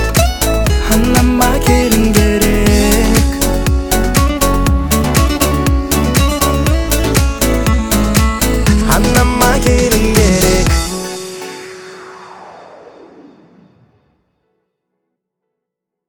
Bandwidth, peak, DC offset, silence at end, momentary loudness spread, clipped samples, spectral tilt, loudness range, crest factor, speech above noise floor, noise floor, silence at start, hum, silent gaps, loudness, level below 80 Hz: 19.5 kHz; 0 dBFS; under 0.1%; 2.8 s; 11 LU; under 0.1%; -4.5 dB/octave; 6 LU; 12 dB; 69 dB; -79 dBFS; 0 s; none; none; -12 LUFS; -18 dBFS